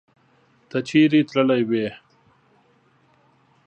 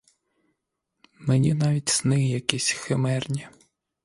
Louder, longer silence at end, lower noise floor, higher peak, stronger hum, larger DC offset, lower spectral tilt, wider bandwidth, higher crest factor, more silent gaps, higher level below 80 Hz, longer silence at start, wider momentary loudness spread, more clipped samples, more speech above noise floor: first, -20 LUFS vs -24 LUFS; first, 1.7 s vs 0.55 s; second, -60 dBFS vs -80 dBFS; second, -4 dBFS vs 0 dBFS; neither; neither; first, -6.5 dB/octave vs -4.5 dB/octave; second, 8.6 kHz vs 11.5 kHz; second, 20 dB vs 26 dB; neither; second, -68 dBFS vs -58 dBFS; second, 0.75 s vs 1.2 s; first, 12 LU vs 9 LU; neither; second, 41 dB vs 56 dB